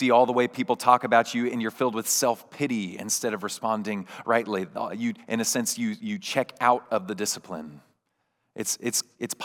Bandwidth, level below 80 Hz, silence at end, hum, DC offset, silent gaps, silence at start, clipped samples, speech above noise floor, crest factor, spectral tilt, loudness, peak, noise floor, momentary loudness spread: 19 kHz; -84 dBFS; 0 s; none; under 0.1%; none; 0 s; under 0.1%; 50 dB; 24 dB; -3 dB/octave; -26 LUFS; -2 dBFS; -76 dBFS; 11 LU